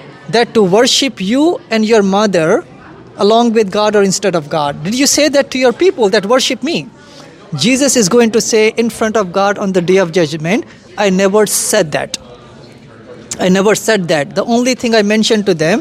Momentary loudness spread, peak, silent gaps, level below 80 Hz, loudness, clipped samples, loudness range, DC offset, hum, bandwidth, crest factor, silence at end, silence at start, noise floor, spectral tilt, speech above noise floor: 7 LU; 0 dBFS; none; -52 dBFS; -12 LUFS; under 0.1%; 3 LU; under 0.1%; none; 16 kHz; 12 dB; 0 s; 0 s; -36 dBFS; -4 dB/octave; 25 dB